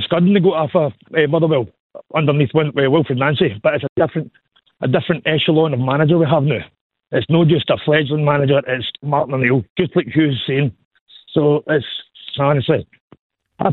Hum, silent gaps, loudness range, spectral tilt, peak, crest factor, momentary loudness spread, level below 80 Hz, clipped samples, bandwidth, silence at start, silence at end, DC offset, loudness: none; 1.80-1.90 s, 3.89-3.96 s, 6.81-6.90 s, 9.70-9.76 s, 10.85-10.91 s, 11.01-11.06 s, 13.00-13.08 s, 13.19-13.30 s; 3 LU; -10 dB/octave; -2 dBFS; 16 dB; 8 LU; -54 dBFS; under 0.1%; 4.2 kHz; 0 s; 0 s; under 0.1%; -17 LUFS